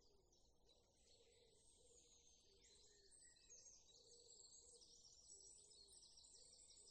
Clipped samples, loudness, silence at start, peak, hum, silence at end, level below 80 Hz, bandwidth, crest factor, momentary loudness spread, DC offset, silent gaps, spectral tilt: under 0.1%; -65 LUFS; 0 s; -50 dBFS; none; 0 s; -84 dBFS; 9.4 kHz; 20 dB; 5 LU; under 0.1%; none; -0.5 dB/octave